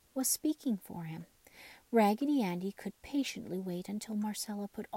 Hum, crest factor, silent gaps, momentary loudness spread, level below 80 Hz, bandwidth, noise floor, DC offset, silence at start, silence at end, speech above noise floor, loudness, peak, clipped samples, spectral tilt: none; 18 dB; none; 17 LU; -72 dBFS; 16.5 kHz; -57 dBFS; under 0.1%; 0.15 s; 0 s; 22 dB; -35 LUFS; -18 dBFS; under 0.1%; -4.5 dB/octave